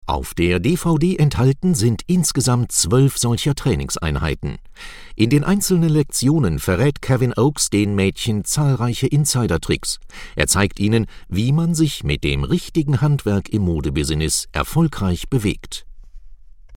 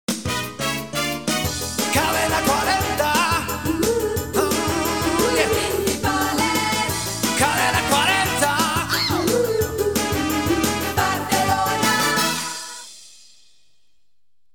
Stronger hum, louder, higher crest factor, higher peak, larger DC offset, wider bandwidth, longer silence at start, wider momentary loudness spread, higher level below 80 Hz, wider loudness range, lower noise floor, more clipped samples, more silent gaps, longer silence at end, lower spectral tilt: neither; about the same, -18 LUFS vs -20 LUFS; about the same, 18 dB vs 18 dB; first, 0 dBFS vs -4 dBFS; second, under 0.1% vs 0.4%; about the same, 17.5 kHz vs 19 kHz; about the same, 0.05 s vs 0.1 s; about the same, 7 LU vs 6 LU; first, -34 dBFS vs -40 dBFS; about the same, 2 LU vs 2 LU; second, -39 dBFS vs -79 dBFS; neither; neither; second, 0 s vs 1.45 s; first, -5 dB/octave vs -3 dB/octave